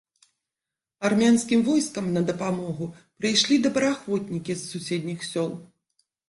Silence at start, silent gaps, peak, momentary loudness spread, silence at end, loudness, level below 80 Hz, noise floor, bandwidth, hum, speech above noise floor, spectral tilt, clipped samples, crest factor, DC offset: 1 s; none; -8 dBFS; 12 LU; 0.65 s; -24 LUFS; -64 dBFS; -89 dBFS; 11.5 kHz; none; 65 dB; -4.5 dB/octave; under 0.1%; 18 dB; under 0.1%